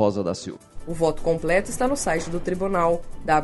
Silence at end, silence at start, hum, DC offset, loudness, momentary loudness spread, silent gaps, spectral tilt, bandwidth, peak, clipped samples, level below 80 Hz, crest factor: 0 s; 0 s; none; under 0.1%; -24 LUFS; 11 LU; none; -5 dB/octave; 11.5 kHz; -6 dBFS; under 0.1%; -38 dBFS; 16 dB